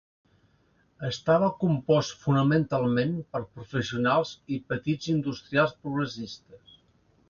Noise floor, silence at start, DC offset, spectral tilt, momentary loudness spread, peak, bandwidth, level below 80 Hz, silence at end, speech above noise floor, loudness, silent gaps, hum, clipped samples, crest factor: -66 dBFS; 1 s; under 0.1%; -6.5 dB/octave; 12 LU; -10 dBFS; 7.2 kHz; -60 dBFS; 0.75 s; 39 dB; -27 LUFS; none; none; under 0.1%; 18 dB